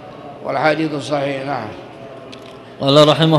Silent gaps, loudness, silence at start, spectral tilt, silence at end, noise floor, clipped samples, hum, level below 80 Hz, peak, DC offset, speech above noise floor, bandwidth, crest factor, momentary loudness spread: none; -16 LUFS; 0 s; -6 dB/octave; 0 s; -36 dBFS; under 0.1%; none; -56 dBFS; 0 dBFS; under 0.1%; 21 dB; 12 kHz; 16 dB; 24 LU